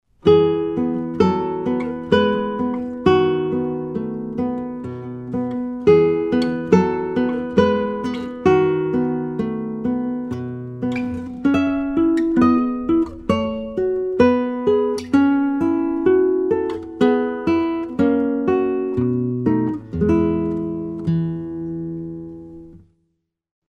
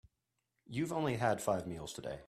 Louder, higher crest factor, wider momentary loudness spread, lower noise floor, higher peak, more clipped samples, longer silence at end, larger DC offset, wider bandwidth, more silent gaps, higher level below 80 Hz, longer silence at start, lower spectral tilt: first, -20 LUFS vs -37 LUFS; about the same, 20 dB vs 20 dB; about the same, 10 LU vs 10 LU; second, -71 dBFS vs -86 dBFS; first, 0 dBFS vs -18 dBFS; neither; first, 0.9 s vs 0 s; neither; second, 9.6 kHz vs 15.5 kHz; neither; first, -46 dBFS vs -66 dBFS; second, 0.25 s vs 0.7 s; first, -8 dB/octave vs -5.5 dB/octave